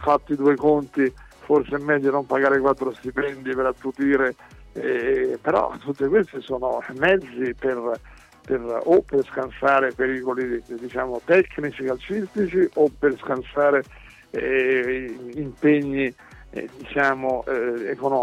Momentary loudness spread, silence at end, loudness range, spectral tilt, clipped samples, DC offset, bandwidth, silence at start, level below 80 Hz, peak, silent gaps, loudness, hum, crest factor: 10 LU; 0 s; 2 LU; -7 dB/octave; under 0.1%; under 0.1%; 9.6 kHz; 0 s; -50 dBFS; -6 dBFS; none; -22 LUFS; none; 16 dB